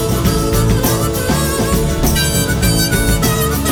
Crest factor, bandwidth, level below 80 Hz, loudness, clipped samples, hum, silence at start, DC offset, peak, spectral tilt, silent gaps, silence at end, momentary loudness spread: 12 dB; over 20 kHz; -20 dBFS; -14 LUFS; under 0.1%; none; 0 s; under 0.1%; -2 dBFS; -4.5 dB/octave; none; 0 s; 2 LU